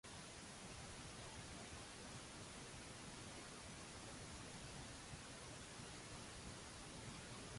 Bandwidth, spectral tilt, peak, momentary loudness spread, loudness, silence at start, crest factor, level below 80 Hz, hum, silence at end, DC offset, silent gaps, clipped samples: 11.5 kHz; -3 dB/octave; -40 dBFS; 1 LU; -54 LUFS; 0.05 s; 14 dB; -66 dBFS; none; 0 s; under 0.1%; none; under 0.1%